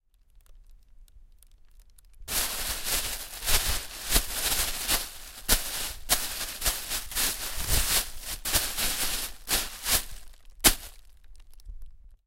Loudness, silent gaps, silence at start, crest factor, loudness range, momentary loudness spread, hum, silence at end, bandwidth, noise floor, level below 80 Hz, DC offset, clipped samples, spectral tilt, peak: -27 LUFS; none; 0.35 s; 26 dB; 3 LU; 9 LU; none; 0.1 s; 16 kHz; -58 dBFS; -38 dBFS; under 0.1%; under 0.1%; -0.5 dB/octave; -4 dBFS